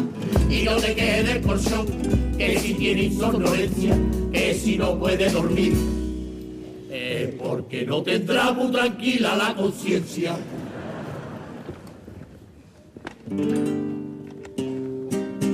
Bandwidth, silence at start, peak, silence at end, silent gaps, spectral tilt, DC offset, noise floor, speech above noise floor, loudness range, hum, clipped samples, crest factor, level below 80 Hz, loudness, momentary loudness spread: 15.5 kHz; 0 s; -10 dBFS; 0 s; none; -5.5 dB/octave; under 0.1%; -48 dBFS; 26 dB; 9 LU; none; under 0.1%; 14 dB; -34 dBFS; -23 LUFS; 16 LU